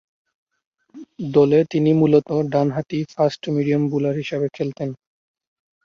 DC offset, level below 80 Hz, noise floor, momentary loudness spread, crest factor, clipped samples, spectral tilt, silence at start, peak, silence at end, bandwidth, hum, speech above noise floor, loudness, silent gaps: under 0.1%; -62 dBFS; -39 dBFS; 11 LU; 18 dB; under 0.1%; -8.5 dB/octave; 0.95 s; -2 dBFS; 0.9 s; 7.2 kHz; none; 20 dB; -20 LUFS; none